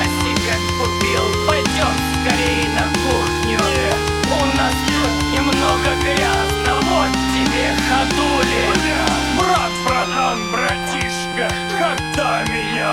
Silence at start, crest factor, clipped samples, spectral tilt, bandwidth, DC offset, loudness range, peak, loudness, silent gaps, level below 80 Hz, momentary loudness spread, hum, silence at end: 0 s; 16 dB; under 0.1%; -4 dB/octave; 19.5 kHz; under 0.1%; 2 LU; 0 dBFS; -17 LUFS; none; -30 dBFS; 3 LU; none; 0 s